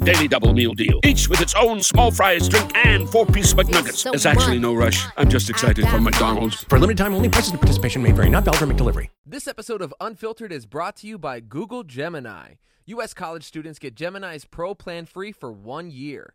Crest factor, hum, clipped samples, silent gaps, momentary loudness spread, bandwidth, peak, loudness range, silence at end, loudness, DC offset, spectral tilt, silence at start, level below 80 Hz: 18 dB; none; under 0.1%; 9.18-9.24 s; 18 LU; over 20 kHz; -2 dBFS; 16 LU; 0.15 s; -17 LUFS; under 0.1%; -4.5 dB/octave; 0 s; -26 dBFS